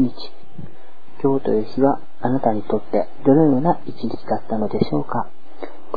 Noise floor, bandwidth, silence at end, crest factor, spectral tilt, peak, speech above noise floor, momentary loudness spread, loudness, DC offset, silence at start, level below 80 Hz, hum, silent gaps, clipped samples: -48 dBFS; 4.9 kHz; 0 s; 20 dB; -10.5 dB/octave; -2 dBFS; 29 dB; 21 LU; -20 LUFS; 8%; 0 s; -54 dBFS; none; none; under 0.1%